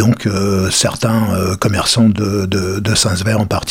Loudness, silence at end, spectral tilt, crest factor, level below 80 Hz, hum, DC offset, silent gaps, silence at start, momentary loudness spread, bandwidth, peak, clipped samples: -14 LUFS; 0 s; -4.5 dB/octave; 14 dB; -40 dBFS; none; under 0.1%; none; 0 s; 4 LU; 17 kHz; -2 dBFS; under 0.1%